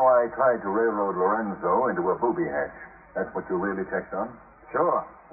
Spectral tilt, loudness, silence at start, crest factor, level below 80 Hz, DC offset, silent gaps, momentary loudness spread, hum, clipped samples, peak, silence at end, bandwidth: -1 dB/octave; -26 LUFS; 0 s; 16 dB; -60 dBFS; under 0.1%; none; 10 LU; none; under 0.1%; -10 dBFS; 0.2 s; 2.6 kHz